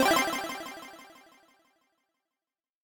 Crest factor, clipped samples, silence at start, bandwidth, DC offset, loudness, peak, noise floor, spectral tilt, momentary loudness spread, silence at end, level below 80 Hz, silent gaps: 20 dB; under 0.1%; 0 s; 19 kHz; under 0.1%; -30 LUFS; -12 dBFS; under -90 dBFS; -2 dB/octave; 25 LU; 1.75 s; -66 dBFS; none